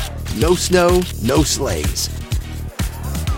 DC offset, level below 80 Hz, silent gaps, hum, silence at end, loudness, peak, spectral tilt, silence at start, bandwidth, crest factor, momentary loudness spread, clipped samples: under 0.1%; -26 dBFS; none; none; 0 s; -18 LUFS; -2 dBFS; -4.5 dB/octave; 0 s; 17 kHz; 16 dB; 11 LU; under 0.1%